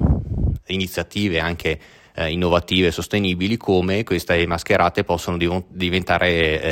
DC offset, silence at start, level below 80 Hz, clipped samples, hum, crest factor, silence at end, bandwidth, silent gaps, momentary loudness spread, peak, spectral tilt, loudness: under 0.1%; 0 s; -34 dBFS; under 0.1%; none; 16 dB; 0 s; 16.5 kHz; none; 7 LU; -4 dBFS; -5.5 dB/octave; -20 LUFS